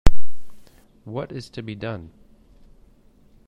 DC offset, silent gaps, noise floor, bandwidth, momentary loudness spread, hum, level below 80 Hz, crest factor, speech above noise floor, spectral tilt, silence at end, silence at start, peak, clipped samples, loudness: under 0.1%; none; -54 dBFS; 8.4 kHz; 24 LU; none; -30 dBFS; 18 dB; 26 dB; -6.5 dB/octave; 0 s; 0.05 s; 0 dBFS; 0.3%; -32 LUFS